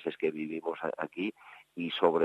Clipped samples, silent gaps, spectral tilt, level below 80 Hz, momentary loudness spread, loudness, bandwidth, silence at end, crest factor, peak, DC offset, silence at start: under 0.1%; none; -6.5 dB/octave; -80 dBFS; 12 LU; -34 LUFS; 8.2 kHz; 0 s; 22 dB; -10 dBFS; under 0.1%; 0 s